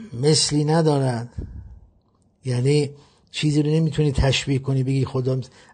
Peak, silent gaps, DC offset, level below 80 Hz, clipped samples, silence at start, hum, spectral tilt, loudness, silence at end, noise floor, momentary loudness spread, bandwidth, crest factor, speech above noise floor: -6 dBFS; none; under 0.1%; -38 dBFS; under 0.1%; 0 s; none; -5.5 dB/octave; -21 LUFS; 0.25 s; -61 dBFS; 15 LU; 9.6 kHz; 16 dB; 41 dB